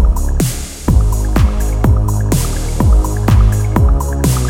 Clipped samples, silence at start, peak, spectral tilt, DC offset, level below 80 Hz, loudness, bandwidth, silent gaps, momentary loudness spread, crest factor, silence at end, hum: under 0.1%; 0 s; 0 dBFS; -6 dB/octave; under 0.1%; -14 dBFS; -14 LUFS; 16.5 kHz; none; 5 LU; 12 dB; 0 s; none